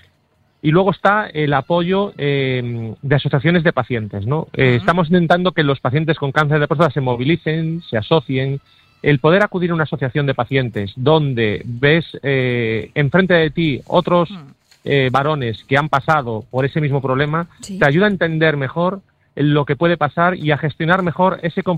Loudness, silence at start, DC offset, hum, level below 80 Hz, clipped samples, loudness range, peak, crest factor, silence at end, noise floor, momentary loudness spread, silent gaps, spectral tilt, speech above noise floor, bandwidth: -17 LUFS; 0.65 s; under 0.1%; none; -48 dBFS; under 0.1%; 2 LU; 0 dBFS; 16 dB; 0 s; -60 dBFS; 7 LU; none; -7.5 dB/octave; 43 dB; 9 kHz